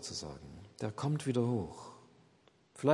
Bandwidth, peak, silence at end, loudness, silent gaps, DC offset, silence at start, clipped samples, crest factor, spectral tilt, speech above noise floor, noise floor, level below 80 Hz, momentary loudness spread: 11.5 kHz; -14 dBFS; 0 s; -37 LUFS; none; under 0.1%; 0 s; under 0.1%; 24 dB; -6 dB/octave; 31 dB; -67 dBFS; -66 dBFS; 20 LU